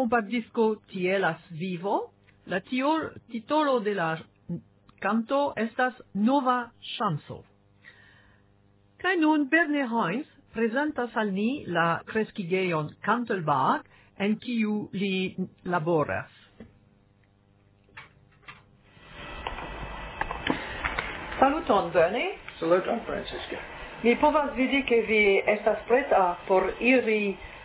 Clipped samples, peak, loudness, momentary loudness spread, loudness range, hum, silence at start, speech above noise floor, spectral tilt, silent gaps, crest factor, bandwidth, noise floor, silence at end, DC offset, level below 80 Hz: under 0.1%; -8 dBFS; -27 LUFS; 14 LU; 10 LU; none; 0 s; 36 dB; -9.5 dB/octave; none; 20 dB; 4 kHz; -62 dBFS; 0 s; under 0.1%; -52 dBFS